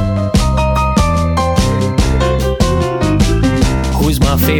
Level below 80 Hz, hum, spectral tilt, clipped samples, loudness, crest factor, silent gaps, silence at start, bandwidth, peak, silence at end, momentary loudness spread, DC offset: -18 dBFS; none; -6 dB/octave; under 0.1%; -13 LUFS; 10 dB; none; 0 s; over 20 kHz; -2 dBFS; 0 s; 2 LU; under 0.1%